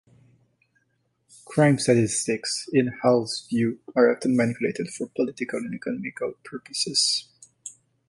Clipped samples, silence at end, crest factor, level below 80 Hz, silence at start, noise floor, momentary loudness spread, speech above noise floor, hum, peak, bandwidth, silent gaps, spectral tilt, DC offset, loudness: under 0.1%; 0.4 s; 18 dB; -64 dBFS; 1.5 s; -71 dBFS; 12 LU; 48 dB; none; -6 dBFS; 11.5 kHz; none; -4.5 dB/octave; under 0.1%; -24 LUFS